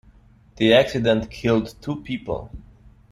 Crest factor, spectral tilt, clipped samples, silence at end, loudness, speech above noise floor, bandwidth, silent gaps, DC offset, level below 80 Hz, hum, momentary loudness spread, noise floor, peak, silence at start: 20 dB; -6 dB/octave; under 0.1%; 0.55 s; -21 LUFS; 31 dB; 14.5 kHz; none; under 0.1%; -46 dBFS; none; 15 LU; -52 dBFS; -2 dBFS; 0.6 s